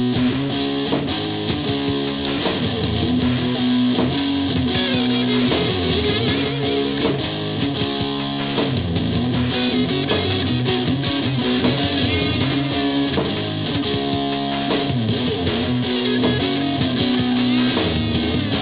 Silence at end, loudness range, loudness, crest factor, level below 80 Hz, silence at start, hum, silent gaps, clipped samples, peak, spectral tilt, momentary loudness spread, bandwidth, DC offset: 0 s; 2 LU; -20 LUFS; 14 dB; -38 dBFS; 0 s; none; none; under 0.1%; -6 dBFS; -10.5 dB/octave; 4 LU; 4 kHz; 0.2%